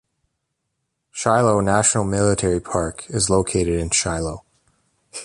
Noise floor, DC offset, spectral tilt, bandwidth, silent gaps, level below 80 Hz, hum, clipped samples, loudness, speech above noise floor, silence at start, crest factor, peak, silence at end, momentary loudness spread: -76 dBFS; under 0.1%; -4 dB/octave; 11.5 kHz; none; -38 dBFS; none; under 0.1%; -19 LUFS; 57 dB; 1.15 s; 18 dB; -2 dBFS; 0 s; 11 LU